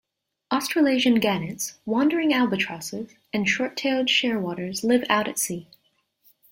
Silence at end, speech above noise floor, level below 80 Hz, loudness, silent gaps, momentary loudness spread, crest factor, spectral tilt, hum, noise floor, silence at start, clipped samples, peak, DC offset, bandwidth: 0.9 s; 45 dB; -64 dBFS; -23 LUFS; none; 11 LU; 20 dB; -3.5 dB/octave; none; -68 dBFS; 0.5 s; under 0.1%; -4 dBFS; under 0.1%; 16.5 kHz